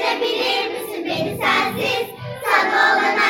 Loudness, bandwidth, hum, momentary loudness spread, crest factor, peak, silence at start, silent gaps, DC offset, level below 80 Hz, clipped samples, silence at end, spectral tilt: -19 LUFS; 17 kHz; none; 10 LU; 16 dB; -2 dBFS; 0 s; none; under 0.1%; -60 dBFS; under 0.1%; 0 s; -3.5 dB/octave